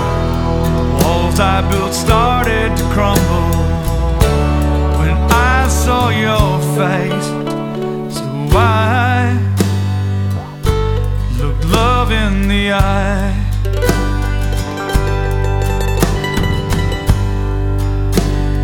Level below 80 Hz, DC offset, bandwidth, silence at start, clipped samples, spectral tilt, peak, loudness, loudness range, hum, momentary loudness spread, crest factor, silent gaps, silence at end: -18 dBFS; under 0.1%; 19 kHz; 0 s; under 0.1%; -5.5 dB/octave; 0 dBFS; -15 LUFS; 3 LU; none; 6 LU; 14 dB; none; 0 s